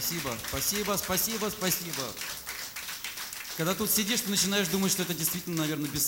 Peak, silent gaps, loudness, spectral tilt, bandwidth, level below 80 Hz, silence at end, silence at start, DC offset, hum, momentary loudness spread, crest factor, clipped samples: -12 dBFS; none; -29 LUFS; -2.5 dB/octave; 17 kHz; -56 dBFS; 0 s; 0 s; under 0.1%; none; 10 LU; 18 dB; under 0.1%